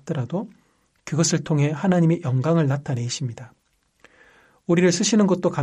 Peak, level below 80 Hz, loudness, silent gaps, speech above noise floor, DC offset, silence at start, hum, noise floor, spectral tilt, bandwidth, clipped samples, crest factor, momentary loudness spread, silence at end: -6 dBFS; -62 dBFS; -21 LUFS; none; 37 dB; under 0.1%; 0.05 s; none; -58 dBFS; -5.5 dB/octave; 11 kHz; under 0.1%; 16 dB; 14 LU; 0 s